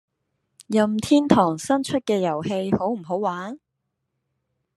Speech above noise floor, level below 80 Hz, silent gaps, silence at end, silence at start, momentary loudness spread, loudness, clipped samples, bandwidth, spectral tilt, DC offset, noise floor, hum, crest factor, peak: 57 dB; -60 dBFS; none; 1.2 s; 0.6 s; 9 LU; -22 LUFS; under 0.1%; 12.5 kHz; -6 dB/octave; under 0.1%; -78 dBFS; none; 24 dB; 0 dBFS